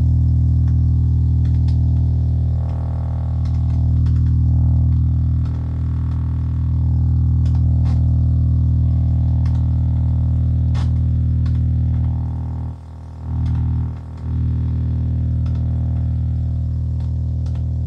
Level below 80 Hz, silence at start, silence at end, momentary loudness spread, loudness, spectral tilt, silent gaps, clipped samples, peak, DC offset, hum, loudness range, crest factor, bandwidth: -24 dBFS; 0 s; 0 s; 6 LU; -19 LUFS; -10.5 dB/octave; none; under 0.1%; -8 dBFS; under 0.1%; none; 4 LU; 10 dB; 3.6 kHz